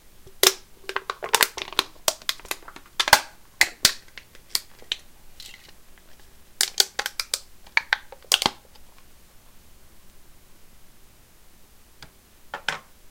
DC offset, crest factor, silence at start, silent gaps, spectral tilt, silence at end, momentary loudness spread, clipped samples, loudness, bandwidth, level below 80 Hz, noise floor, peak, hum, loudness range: under 0.1%; 28 dB; 0.25 s; none; 0.5 dB/octave; 0 s; 20 LU; under 0.1%; -23 LUFS; 17 kHz; -54 dBFS; -51 dBFS; 0 dBFS; none; 7 LU